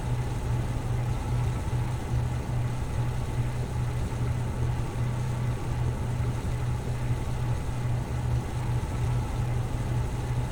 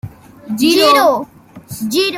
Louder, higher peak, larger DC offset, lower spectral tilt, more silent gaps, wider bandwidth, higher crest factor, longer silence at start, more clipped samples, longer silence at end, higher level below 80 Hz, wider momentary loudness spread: second, -30 LUFS vs -12 LUFS; second, -16 dBFS vs 0 dBFS; neither; first, -7 dB/octave vs -3.5 dB/octave; neither; about the same, 16.5 kHz vs 16.5 kHz; about the same, 12 dB vs 14 dB; about the same, 0 s vs 0.05 s; neither; about the same, 0 s vs 0 s; first, -34 dBFS vs -52 dBFS; second, 1 LU vs 23 LU